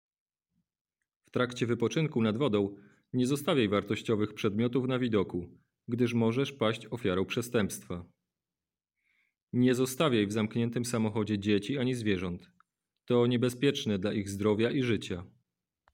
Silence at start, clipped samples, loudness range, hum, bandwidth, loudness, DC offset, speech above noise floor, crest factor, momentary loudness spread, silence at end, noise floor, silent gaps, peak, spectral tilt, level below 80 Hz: 1.35 s; under 0.1%; 3 LU; none; 17 kHz; -30 LUFS; under 0.1%; over 60 dB; 18 dB; 9 LU; 0.65 s; under -90 dBFS; 9.43-9.47 s; -14 dBFS; -6 dB/octave; -66 dBFS